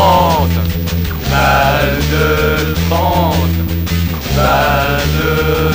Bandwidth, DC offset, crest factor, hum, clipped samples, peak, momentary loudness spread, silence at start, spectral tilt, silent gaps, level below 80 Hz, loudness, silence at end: 16.5 kHz; 0.2%; 12 dB; none; under 0.1%; 0 dBFS; 6 LU; 0 s; -5.5 dB/octave; none; -22 dBFS; -13 LUFS; 0 s